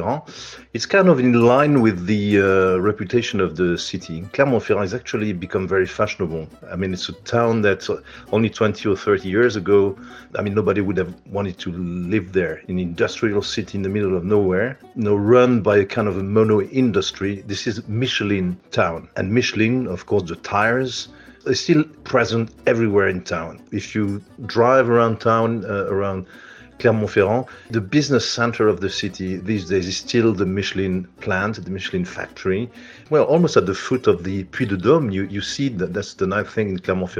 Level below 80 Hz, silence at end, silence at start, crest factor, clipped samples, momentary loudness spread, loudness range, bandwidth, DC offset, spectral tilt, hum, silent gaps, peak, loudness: -52 dBFS; 0 s; 0 s; 18 dB; under 0.1%; 11 LU; 4 LU; 9.8 kHz; under 0.1%; -6 dB/octave; none; none; -2 dBFS; -20 LUFS